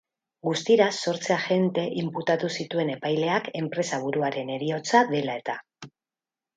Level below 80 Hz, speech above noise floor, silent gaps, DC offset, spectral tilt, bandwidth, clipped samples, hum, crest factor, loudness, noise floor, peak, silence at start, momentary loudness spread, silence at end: -74 dBFS; over 65 dB; none; under 0.1%; -5 dB/octave; 9.4 kHz; under 0.1%; none; 22 dB; -26 LUFS; under -90 dBFS; -4 dBFS; 0.45 s; 9 LU; 0.7 s